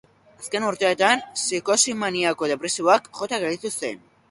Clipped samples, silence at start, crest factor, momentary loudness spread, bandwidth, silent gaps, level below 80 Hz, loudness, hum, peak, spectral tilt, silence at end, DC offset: under 0.1%; 0.4 s; 20 dB; 10 LU; 11.5 kHz; none; -68 dBFS; -22 LUFS; none; -2 dBFS; -2 dB/octave; 0.35 s; under 0.1%